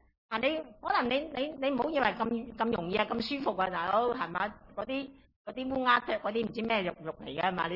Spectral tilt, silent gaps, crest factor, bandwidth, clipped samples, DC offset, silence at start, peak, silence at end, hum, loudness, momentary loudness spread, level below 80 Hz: -7 dB/octave; 5.36-5.45 s; 20 dB; 5.8 kHz; under 0.1%; under 0.1%; 0.3 s; -12 dBFS; 0 s; none; -32 LUFS; 9 LU; -60 dBFS